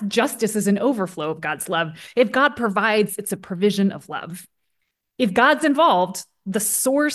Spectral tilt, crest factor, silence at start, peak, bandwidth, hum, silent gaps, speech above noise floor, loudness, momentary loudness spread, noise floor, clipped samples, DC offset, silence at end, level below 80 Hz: -4 dB/octave; 16 dB; 0 s; -4 dBFS; 13 kHz; none; none; 54 dB; -20 LUFS; 12 LU; -74 dBFS; under 0.1%; under 0.1%; 0 s; -64 dBFS